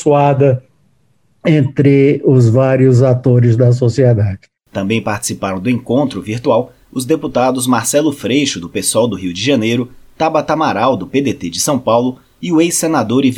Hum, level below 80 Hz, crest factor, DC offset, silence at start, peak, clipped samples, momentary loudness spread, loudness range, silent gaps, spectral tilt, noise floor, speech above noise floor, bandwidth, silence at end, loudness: none; -50 dBFS; 12 dB; under 0.1%; 0 s; 0 dBFS; under 0.1%; 9 LU; 5 LU; none; -6 dB/octave; -58 dBFS; 45 dB; 16.5 kHz; 0 s; -13 LUFS